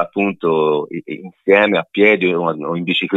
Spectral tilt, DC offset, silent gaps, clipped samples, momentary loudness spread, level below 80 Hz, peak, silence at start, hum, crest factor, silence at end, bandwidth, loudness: -7.5 dB/octave; under 0.1%; none; under 0.1%; 13 LU; -62 dBFS; 0 dBFS; 0 s; none; 16 dB; 0 s; 6.6 kHz; -16 LUFS